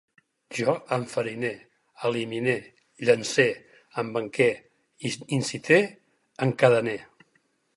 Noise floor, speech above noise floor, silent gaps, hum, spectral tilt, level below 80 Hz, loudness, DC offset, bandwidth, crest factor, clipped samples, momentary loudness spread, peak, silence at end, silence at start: -69 dBFS; 44 dB; none; none; -5 dB/octave; -72 dBFS; -26 LUFS; under 0.1%; 11.5 kHz; 22 dB; under 0.1%; 14 LU; -4 dBFS; 0.7 s; 0.5 s